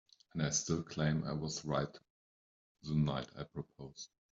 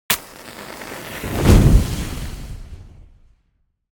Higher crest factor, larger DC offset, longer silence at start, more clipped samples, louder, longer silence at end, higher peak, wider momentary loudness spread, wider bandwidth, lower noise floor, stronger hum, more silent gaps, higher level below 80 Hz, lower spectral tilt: about the same, 18 dB vs 20 dB; neither; first, 0.35 s vs 0.1 s; neither; second, -38 LUFS vs -18 LUFS; second, 0.25 s vs 0.9 s; second, -20 dBFS vs 0 dBFS; second, 15 LU vs 23 LU; second, 7.8 kHz vs 17.5 kHz; first, under -90 dBFS vs -66 dBFS; neither; first, 2.10-2.75 s vs none; second, -62 dBFS vs -24 dBFS; about the same, -5 dB/octave vs -5.5 dB/octave